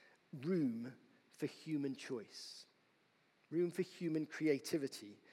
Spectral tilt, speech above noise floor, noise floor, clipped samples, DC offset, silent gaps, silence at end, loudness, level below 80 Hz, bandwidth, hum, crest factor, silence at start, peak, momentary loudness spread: -6 dB/octave; 34 dB; -75 dBFS; under 0.1%; under 0.1%; none; 0.15 s; -42 LUFS; under -90 dBFS; 16 kHz; none; 20 dB; 0.35 s; -24 dBFS; 14 LU